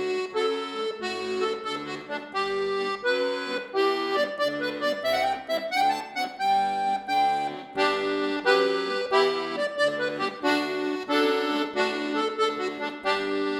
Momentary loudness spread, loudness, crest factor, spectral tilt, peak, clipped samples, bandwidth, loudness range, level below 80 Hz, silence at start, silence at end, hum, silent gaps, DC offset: 7 LU; -26 LUFS; 20 dB; -3.5 dB/octave; -8 dBFS; under 0.1%; 17 kHz; 3 LU; -66 dBFS; 0 s; 0 s; none; none; under 0.1%